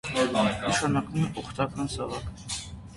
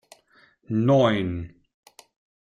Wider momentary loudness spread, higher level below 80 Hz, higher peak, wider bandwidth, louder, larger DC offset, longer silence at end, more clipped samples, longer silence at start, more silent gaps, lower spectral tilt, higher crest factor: second, 10 LU vs 16 LU; first, -48 dBFS vs -56 dBFS; second, -12 dBFS vs -8 dBFS; about the same, 11.5 kHz vs 12 kHz; second, -29 LUFS vs -23 LUFS; neither; second, 0 s vs 1 s; neither; second, 0.05 s vs 0.7 s; neither; second, -4.5 dB/octave vs -7.5 dB/octave; about the same, 18 dB vs 18 dB